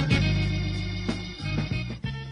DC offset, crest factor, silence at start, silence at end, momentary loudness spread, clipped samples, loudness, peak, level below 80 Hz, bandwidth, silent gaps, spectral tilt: under 0.1%; 18 dB; 0 s; 0 s; 9 LU; under 0.1%; -28 LUFS; -10 dBFS; -36 dBFS; 10.5 kHz; none; -6 dB/octave